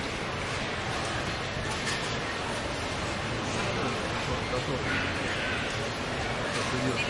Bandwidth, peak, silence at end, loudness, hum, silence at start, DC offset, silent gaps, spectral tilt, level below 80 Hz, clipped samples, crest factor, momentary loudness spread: 11.5 kHz; -16 dBFS; 0 s; -30 LUFS; none; 0 s; under 0.1%; none; -4 dB/octave; -46 dBFS; under 0.1%; 16 dB; 3 LU